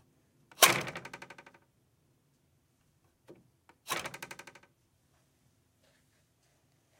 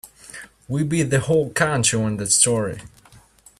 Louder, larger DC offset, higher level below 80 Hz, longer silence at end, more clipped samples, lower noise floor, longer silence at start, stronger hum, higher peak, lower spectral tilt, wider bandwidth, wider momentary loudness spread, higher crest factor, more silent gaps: second, -28 LUFS vs -19 LUFS; neither; second, -76 dBFS vs -52 dBFS; first, 2.65 s vs 0.7 s; neither; first, -72 dBFS vs -51 dBFS; first, 0.6 s vs 0.05 s; neither; about the same, -4 dBFS vs -4 dBFS; second, -0.5 dB/octave vs -3.5 dB/octave; first, 17 kHz vs 14.5 kHz; first, 26 LU vs 23 LU; first, 34 dB vs 18 dB; neither